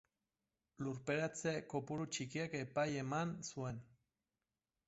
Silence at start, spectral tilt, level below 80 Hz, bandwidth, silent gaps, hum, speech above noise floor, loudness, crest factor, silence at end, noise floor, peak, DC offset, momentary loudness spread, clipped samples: 0.8 s; -5 dB/octave; -74 dBFS; 8 kHz; none; none; over 48 dB; -42 LUFS; 18 dB; 1 s; under -90 dBFS; -26 dBFS; under 0.1%; 7 LU; under 0.1%